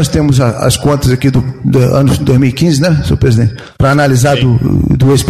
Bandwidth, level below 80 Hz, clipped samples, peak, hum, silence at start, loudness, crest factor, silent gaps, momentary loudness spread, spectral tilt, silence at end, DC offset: 14.5 kHz; -26 dBFS; under 0.1%; 0 dBFS; none; 0 s; -10 LUFS; 8 dB; none; 4 LU; -6.5 dB/octave; 0 s; under 0.1%